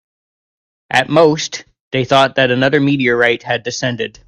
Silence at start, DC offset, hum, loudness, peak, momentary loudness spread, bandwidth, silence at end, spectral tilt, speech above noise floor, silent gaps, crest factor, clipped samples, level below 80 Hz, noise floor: 0.9 s; under 0.1%; none; -14 LUFS; 0 dBFS; 9 LU; 11.5 kHz; 0.2 s; -4.5 dB/octave; over 76 dB; 1.80-1.91 s; 16 dB; under 0.1%; -52 dBFS; under -90 dBFS